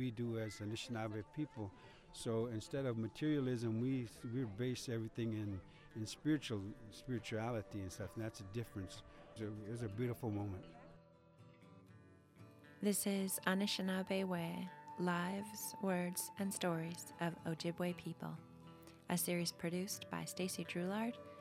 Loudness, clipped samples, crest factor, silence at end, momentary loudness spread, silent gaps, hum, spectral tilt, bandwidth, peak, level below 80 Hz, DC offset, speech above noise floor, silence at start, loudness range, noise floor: -42 LUFS; under 0.1%; 24 dB; 0 s; 16 LU; none; none; -5 dB/octave; 16 kHz; -20 dBFS; -70 dBFS; under 0.1%; 22 dB; 0 s; 6 LU; -64 dBFS